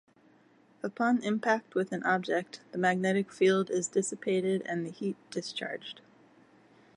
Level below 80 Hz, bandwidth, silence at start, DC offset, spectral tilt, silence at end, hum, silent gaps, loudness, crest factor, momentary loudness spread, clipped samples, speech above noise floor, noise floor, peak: -80 dBFS; 11 kHz; 0.85 s; under 0.1%; -5 dB/octave; 1 s; none; none; -31 LUFS; 20 dB; 13 LU; under 0.1%; 32 dB; -63 dBFS; -12 dBFS